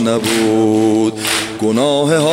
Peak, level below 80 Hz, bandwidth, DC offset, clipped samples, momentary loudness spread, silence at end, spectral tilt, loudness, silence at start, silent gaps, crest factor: -2 dBFS; -54 dBFS; 16 kHz; under 0.1%; under 0.1%; 4 LU; 0 s; -4.5 dB/octave; -14 LUFS; 0 s; none; 10 dB